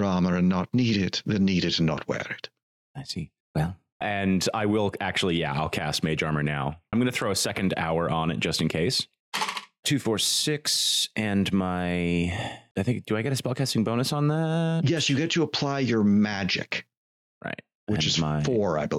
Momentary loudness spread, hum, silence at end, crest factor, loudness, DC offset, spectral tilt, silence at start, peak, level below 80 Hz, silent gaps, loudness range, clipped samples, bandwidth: 10 LU; none; 0 s; 12 dB; -26 LUFS; under 0.1%; -4.5 dB/octave; 0 s; -14 dBFS; -52 dBFS; 2.63-2.94 s, 3.40-3.54 s, 3.92-4.00 s, 9.20-9.32 s, 9.79-9.83 s, 12.71-12.75 s, 16.97-17.41 s, 17.75-17.87 s; 3 LU; under 0.1%; 16 kHz